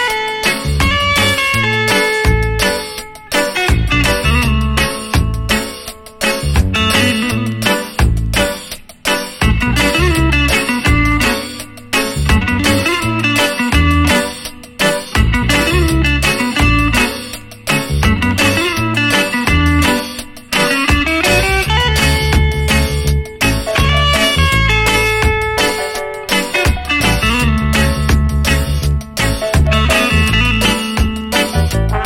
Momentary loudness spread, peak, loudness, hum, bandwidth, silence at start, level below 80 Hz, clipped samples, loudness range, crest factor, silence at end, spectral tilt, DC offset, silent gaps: 6 LU; 0 dBFS; -13 LUFS; none; 17 kHz; 0 s; -20 dBFS; under 0.1%; 2 LU; 14 dB; 0 s; -4.5 dB/octave; under 0.1%; none